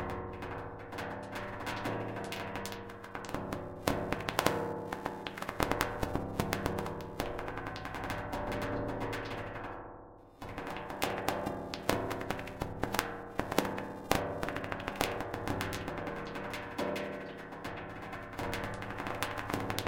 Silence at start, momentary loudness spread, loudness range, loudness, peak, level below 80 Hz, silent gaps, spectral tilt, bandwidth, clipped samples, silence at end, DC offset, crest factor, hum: 0 s; 9 LU; 4 LU; -37 LUFS; -8 dBFS; -52 dBFS; none; -4.5 dB/octave; 17 kHz; under 0.1%; 0 s; under 0.1%; 30 dB; none